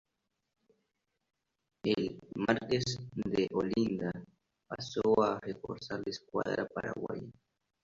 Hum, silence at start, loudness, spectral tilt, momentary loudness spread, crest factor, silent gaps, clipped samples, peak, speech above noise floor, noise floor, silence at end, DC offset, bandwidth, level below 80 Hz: none; 1.85 s; -34 LUFS; -5.5 dB/octave; 12 LU; 24 dB; none; under 0.1%; -12 dBFS; 50 dB; -83 dBFS; 0.5 s; under 0.1%; 7.8 kHz; -66 dBFS